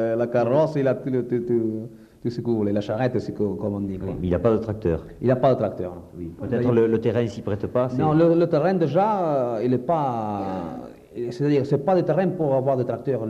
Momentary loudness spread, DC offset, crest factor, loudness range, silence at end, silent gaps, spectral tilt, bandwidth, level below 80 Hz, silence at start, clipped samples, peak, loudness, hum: 12 LU; under 0.1%; 16 dB; 4 LU; 0 s; none; -9 dB/octave; 8.6 kHz; -50 dBFS; 0 s; under 0.1%; -6 dBFS; -23 LUFS; none